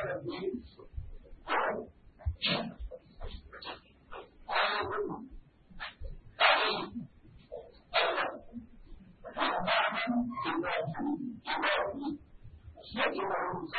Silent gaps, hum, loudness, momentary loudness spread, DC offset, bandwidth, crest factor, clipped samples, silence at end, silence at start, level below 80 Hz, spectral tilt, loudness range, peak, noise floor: none; none; -32 LUFS; 21 LU; under 0.1%; 4.8 kHz; 24 dB; under 0.1%; 0 s; 0 s; -52 dBFS; -1.5 dB/octave; 5 LU; -12 dBFS; -54 dBFS